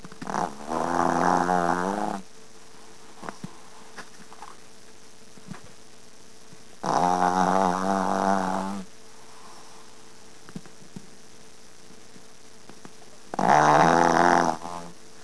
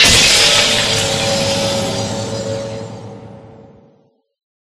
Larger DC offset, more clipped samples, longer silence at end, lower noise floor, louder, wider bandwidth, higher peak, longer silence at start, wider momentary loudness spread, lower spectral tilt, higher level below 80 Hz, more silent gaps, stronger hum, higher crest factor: first, 0.9% vs under 0.1%; neither; second, 0.3 s vs 1.15 s; second, -51 dBFS vs -55 dBFS; second, -23 LUFS vs -12 LUFS; second, 11 kHz vs 17 kHz; second, -4 dBFS vs 0 dBFS; about the same, 0.05 s vs 0 s; first, 26 LU vs 21 LU; first, -5 dB/octave vs -2 dB/octave; second, -62 dBFS vs -38 dBFS; neither; neither; first, 22 dB vs 16 dB